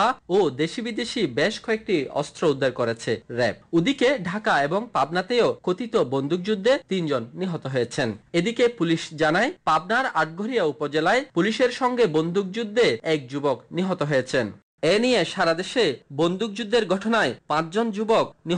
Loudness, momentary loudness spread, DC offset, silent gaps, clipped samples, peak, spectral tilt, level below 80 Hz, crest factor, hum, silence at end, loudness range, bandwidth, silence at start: -23 LUFS; 6 LU; under 0.1%; 14.63-14.78 s; under 0.1%; -10 dBFS; -5 dB/octave; -60 dBFS; 12 dB; none; 0 s; 2 LU; 10 kHz; 0 s